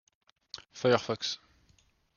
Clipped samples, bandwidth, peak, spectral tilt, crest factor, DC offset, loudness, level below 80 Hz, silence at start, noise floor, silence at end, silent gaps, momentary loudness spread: under 0.1%; 7.2 kHz; -10 dBFS; -4.5 dB/octave; 24 dB; under 0.1%; -30 LUFS; -72 dBFS; 0.55 s; -68 dBFS; 0.8 s; none; 19 LU